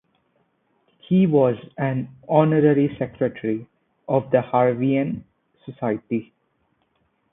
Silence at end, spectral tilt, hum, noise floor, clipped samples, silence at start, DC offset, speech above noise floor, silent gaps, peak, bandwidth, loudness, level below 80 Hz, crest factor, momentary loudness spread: 1.1 s; -13 dB/octave; none; -68 dBFS; under 0.1%; 1.1 s; under 0.1%; 48 dB; none; -2 dBFS; 3.9 kHz; -21 LUFS; -60 dBFS; 20 dB; 12 LU